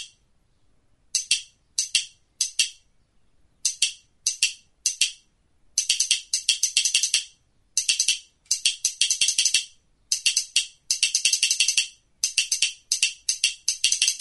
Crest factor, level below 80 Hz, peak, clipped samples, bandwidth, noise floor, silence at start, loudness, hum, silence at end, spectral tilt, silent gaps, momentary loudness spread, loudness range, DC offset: 26 dB; -66 dBFS; 0 dBFS; under 0.1%; 12 kHz; -64 dBFS; 0 s; -22 LUFS; none; 0 s; 5.5 dB/octave; none; 8 LU; 5 LU; under 0.1%